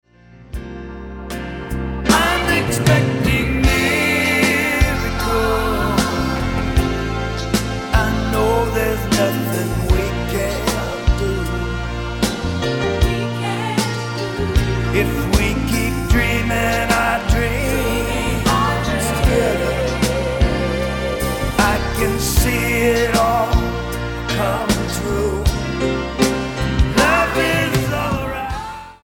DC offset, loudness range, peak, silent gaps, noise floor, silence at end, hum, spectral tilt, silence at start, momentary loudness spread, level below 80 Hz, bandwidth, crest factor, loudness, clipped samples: under 0.1%; 4 LU; 0 dBFS; none; -43 dBFS; 0.1 s; none; -5 dB/octave; 0.3 s; 8 LU; -24 dBFS; 17.5 kHz; 18 dB; -18 LUFS; under 0.1%